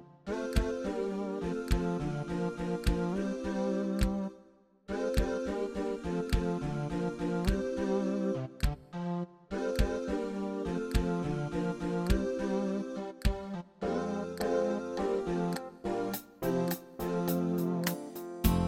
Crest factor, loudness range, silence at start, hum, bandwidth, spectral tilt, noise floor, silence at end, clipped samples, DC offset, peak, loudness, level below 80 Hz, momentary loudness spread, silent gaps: 20 dB; 1 LU; 0 s; none; 16.5 kHz; -6.5 dB/octave; -61 dBFS; 0 s; under 0.1%; under 0.1%; -12 dBFS; -34 LUFS; -40 dBFS; 6 LU; none